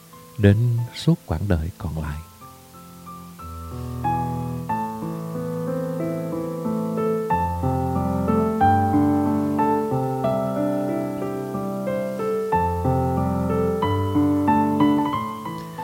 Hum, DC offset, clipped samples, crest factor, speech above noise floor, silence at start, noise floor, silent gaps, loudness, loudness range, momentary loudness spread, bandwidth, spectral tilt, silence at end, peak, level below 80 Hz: none; under 0.1%; under 0.1%; 22 dB; 23 dB; 0.1 s; -44 dBFS; none; -23 LUFS; 8 LU; 13 LU; 16.5 kHz; -8 dB/octave; 0 s; 0 dBFS; -42 dBFS